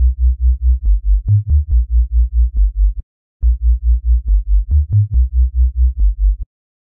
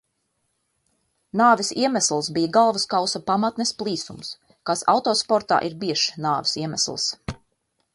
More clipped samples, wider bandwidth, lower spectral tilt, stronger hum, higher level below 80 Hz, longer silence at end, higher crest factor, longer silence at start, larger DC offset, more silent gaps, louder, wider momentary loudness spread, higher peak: neither; second, 0.4 kHz vs 11.5 kHz; first, -14.5 dB/octave vs -3 dB/octave; neither; first, -14 dBFS vs -56 dBFS; second, 0.45 s vs 0.6 s; second, 8 dB vs 20 dB; second, 0 s vs 1.35 s; neither; first, 3.03-3.40 s vs none; first, -16 LUFS vs -22 LUFS; second, 5 LU vs 14 LU; about the same, -4 dBFS vs -4 dBFS